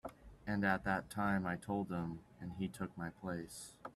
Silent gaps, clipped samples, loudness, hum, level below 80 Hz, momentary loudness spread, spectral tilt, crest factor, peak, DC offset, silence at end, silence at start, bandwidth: none; under 0.1%; -40 LUFS; none; -64 dBFS; 14 LU; -6 dB/octave; 20 dB; -22 dBFS; under 0.1%; 0.05 s; 0.05 s; 13 kHz